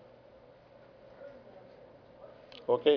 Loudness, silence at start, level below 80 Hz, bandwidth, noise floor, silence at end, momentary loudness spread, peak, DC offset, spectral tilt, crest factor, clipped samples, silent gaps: -35 LUFS; 1.2 s; -74 dBFS; 5.4 kHz; -57 dBFS; 0 s; 22 LU; -14 dBFS; under 0.1%; -3 dB/octave; 22 dB; under 0.1%; none